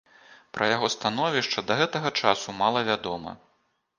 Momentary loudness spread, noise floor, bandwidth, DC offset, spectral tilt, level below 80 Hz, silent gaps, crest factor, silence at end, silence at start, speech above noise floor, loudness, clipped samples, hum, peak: 10 LU; -71 dBFS; 10 kHz; under 0.1%; -3.5 dB/octave; -64 dBFS; none; 22 dB; 0.6 s; 0.3 s; 45 dB; -25 LUFS; under 0.1%; none; -4 dBFS